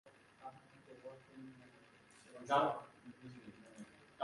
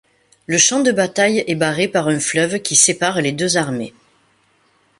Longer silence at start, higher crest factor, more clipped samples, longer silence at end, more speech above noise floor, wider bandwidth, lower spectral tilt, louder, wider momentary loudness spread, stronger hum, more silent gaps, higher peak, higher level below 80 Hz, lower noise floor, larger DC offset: second, 0.05 s vs 0.5 s; first, 26 dB vs 18 dB; neither; second, 0 s vs 1.1 s; second, 25 dB vs 42 dB; about the same, 11.5 kHz vs 12 kHz; first, -5 dB/octave vs -2.5 dB/octave; second, -37 LUFS vs -16 LUFS; first, 27 LU vs 7 LU; neither; neither; second, -20 dBFS vs 0 dBFS; second, -84 dBFS vs -58 dBFS; first, -65 dBFS vs -59 dBFS; neither